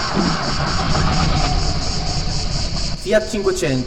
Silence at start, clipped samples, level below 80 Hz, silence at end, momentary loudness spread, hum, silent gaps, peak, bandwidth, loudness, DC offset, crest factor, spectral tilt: 0 s; under 0.1%; -24 dBFS; 0 s; 4 LU; none; none; -2 dBFS; 12.5 kHz; -19 LUFS; 3%; 14 dB; -4.5 dB/octave